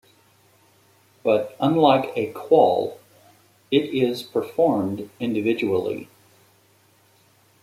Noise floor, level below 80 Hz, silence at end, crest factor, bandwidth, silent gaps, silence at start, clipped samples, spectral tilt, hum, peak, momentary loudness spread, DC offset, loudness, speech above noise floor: -59 dBFS; -68 dBFS; 1.6 s; 20 dB; 15.5 kHz; none; 1.25 s; under 0.1%; -7 dB/octave; none; -2 dBFS; 11 LU; under 0.1%; -22 LUFS; 38 dB